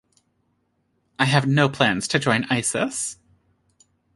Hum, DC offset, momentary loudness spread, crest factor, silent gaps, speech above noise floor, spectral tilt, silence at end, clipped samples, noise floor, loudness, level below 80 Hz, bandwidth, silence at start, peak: none; under 0.1%; 7 LU; 22 dB; none; 49 dB; -4 dB/octave; 1.05 s; under 0.1%; -70 dBFS; -21 LUFS; -60 dBFS; 11.5 kHz; 1.2 s; -2 dBFS